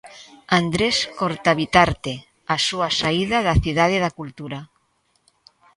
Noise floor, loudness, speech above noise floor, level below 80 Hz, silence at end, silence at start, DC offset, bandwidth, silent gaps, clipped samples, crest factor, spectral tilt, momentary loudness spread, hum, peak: -66 dBFS; -20 LUFS; 46 dB; -38 dBFS; 1.1 s; 0.05 s; under 0.1%; 11.5 kHz; none; under 0.1%; 22 dB; -4.5 dB/octave; 16 LU; none; 0 dBFS